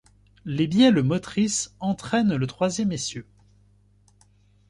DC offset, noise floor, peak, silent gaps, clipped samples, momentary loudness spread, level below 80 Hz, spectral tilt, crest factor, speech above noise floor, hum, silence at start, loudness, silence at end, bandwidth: under 0.1%; -59 dBFS; -6 dBFS; none; under 0.1%; 14 LU; -56 dBFS; -5 dB/octave; 18 dB; 36 dB; 50 Hz at -45 dBFS; 0.45 s; -23 LUFS; 1.5 s; 11.5 kHz